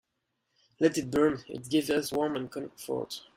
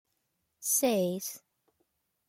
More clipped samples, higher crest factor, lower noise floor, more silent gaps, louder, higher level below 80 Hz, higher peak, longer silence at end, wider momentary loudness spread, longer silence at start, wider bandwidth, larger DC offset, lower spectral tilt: neither; about the same, 20 dB vs 18 dB; about the same, -81 dBFS vs -80 dBFS; neither; about the same, -30 LUFS vs -29 LUFS; first, -64 dBFS vs -78 dBFS; first, -12 dBFS vs -16 dBFS; second, 0.15 s vs 0.9 s; second, 10 LU vs 14 LU; first, 0.8 s vs 0.6 s; about the same, 16 kHz vs 16.5 kHz; neither; first, -5 dB/octave vs -3.5 dB/octave